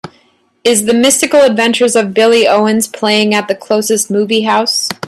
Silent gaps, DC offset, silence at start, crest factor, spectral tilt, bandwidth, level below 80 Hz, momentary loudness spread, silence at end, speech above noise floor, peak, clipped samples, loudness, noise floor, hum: none; under 0.1%; 0.05 s; 12 dB; -2.5 dB/octave; 14.5 kHz; -56 dBFS; 5 LU; 0 s; 41 dB; 0 dBFS; under 0.1%; -11 LUFS; -52 dBFS; none